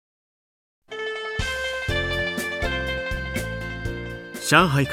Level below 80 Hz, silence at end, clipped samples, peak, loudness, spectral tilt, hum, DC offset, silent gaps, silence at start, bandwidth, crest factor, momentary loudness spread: -38 dBFS; 0 s; under 0.1%; -2 dBFS; -24 LUFS; -4.5 dB/octave; none; under 0.1%; none; 0.9 s; 16.5 kHz; 24 dB; 14 LU